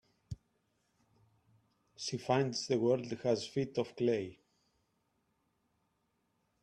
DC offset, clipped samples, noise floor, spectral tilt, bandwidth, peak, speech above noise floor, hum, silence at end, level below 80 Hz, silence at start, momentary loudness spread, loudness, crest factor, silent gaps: under 0.1%; under 0.1%; -80 dBFS; -5.5 dB/octave; 11 kHz; -18 dBFS; 46 dB; none; 2.3 s; -70 dBFS; 0.3 s; 19 LU; -35 LUFS; 20 dB; none